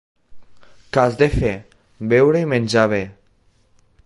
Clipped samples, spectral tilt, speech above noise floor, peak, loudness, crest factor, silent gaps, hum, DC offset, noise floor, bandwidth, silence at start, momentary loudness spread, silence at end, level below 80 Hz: under 0.1%; -6.5 dB/octave; 41 dB; -2 dBFS; -18 LUFS; 18 dB; none; none; under 0.1%; -58 dBFS; 11.5 kHz; 0.3 s; 14 LU; 0.95 s; -38 dBFS